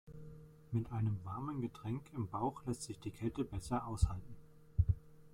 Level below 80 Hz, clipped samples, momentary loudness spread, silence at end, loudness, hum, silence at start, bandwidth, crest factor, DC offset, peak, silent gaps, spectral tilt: -48 dBFS; under 0.1%; 18 LU; 0 s; -41 LUFS; none; 0.05 s; 13.5 kHz; 20 dB; under 0.1%; -18 dBFS; none; -7.5 dB/octave